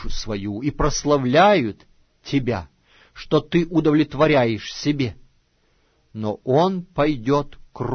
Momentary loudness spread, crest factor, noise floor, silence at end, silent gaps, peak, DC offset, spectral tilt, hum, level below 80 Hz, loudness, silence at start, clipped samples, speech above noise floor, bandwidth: 13 LU; 18 dB; -63 dBFS; 0 s; none; -4 dBFS; under 0.1%; -6 dB/octave; none; -38 dBFS; -21 LUFS; 0 s; under 0.1%; 43 dB; 6.6 kHz